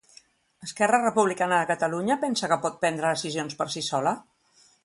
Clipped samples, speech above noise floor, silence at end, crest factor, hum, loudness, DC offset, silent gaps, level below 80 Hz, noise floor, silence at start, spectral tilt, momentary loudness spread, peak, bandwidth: under 0.1%; 36 dB; 0.65 s; 20 dB; none; -25 LUFS; under 0.1%; none; -70 dBFS; -61 dBFS; 0.6 s; -3.5 dB/octave; 8 LU; -8 dBFS; 11.5 kHz